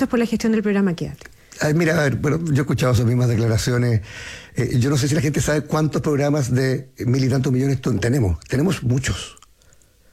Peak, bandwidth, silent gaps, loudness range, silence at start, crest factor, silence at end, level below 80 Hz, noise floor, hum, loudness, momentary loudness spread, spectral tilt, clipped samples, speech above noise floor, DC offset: -8 dBFS; 15 kHz; none; 1 LU; 0 s; 12 dB; 0.8 s; -42 dBFS; -53 dBFS; none; -20 LUFS; 7 LU; -6 dB/octave; under 0.1%; 34 dB; under 0.1%